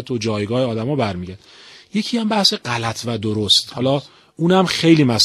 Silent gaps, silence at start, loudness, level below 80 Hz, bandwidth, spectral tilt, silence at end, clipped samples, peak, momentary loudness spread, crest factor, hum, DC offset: none; 0 s; -18 LUFS; -54 dBFS; 13.5 kHz; -4.5 dB/octave; 0 s; under 0.1%; 0 dBFS; 10 LU; 18 dB; none; under 0.1%